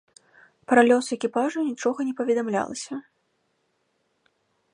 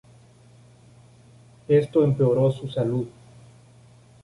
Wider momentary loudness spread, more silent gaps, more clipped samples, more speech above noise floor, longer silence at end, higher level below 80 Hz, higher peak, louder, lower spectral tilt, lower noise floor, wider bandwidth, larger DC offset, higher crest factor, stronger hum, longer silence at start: first, 14 LU vs 8 LU; neither; neither; first, 49 dB vs 31 dB; first, 1.75 s vs 1.15 s; second, -74 dBFS vs -58 dBFS; first, -2 dBFS vs -8 dBFS; about the same, -23 LUFS vs -22 LUFS; second, -4 dB/octave vs -9 dB/octave; first, -72 dBFS vs -52 dBFS; about the same, 11.5 kHz vs 11.5 kHz; neither; first, 24 dB vs 18 dB; neither; second, 0.7 s vs 1.7 s